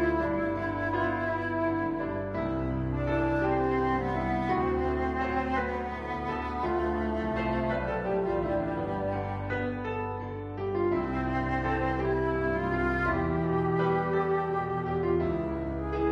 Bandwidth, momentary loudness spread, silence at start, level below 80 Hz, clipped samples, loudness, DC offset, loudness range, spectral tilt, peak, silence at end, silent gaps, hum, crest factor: 7 kHz; 5 LU; 0 s; -42 dBFS; under 0.1%; -30 LUFS; under 0.1%; 3 LU; -9 dB/octave; -14 dBFS; 0 s; none; none; 14 dB